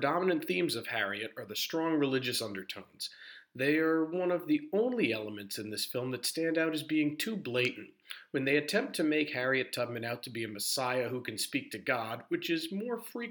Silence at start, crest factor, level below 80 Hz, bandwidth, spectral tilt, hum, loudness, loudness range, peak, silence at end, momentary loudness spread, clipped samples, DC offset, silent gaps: 0 s; 18 dB; -84 dBFS; over 20 kHz; -4 dB/octave; none; -33 LUFS; 2 LU; -16 dBFS; 0 s; 9 LU; under 0.1%; under 0.1%; none